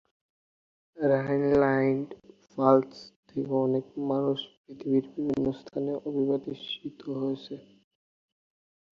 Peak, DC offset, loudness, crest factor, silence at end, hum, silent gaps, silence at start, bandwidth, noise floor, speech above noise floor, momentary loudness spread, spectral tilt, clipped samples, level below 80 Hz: -6 dBFS; under 0.1%; -28 LUFS; 22 dB; 1.3 s; none; 3.16-3.23 s, 4.57-4.64 s; 0.95 s; 6.8 kHz; under -90 dBFS; over 62 dB; 17 LU; -8 dB/octave; under 0.1%; -64 dBFS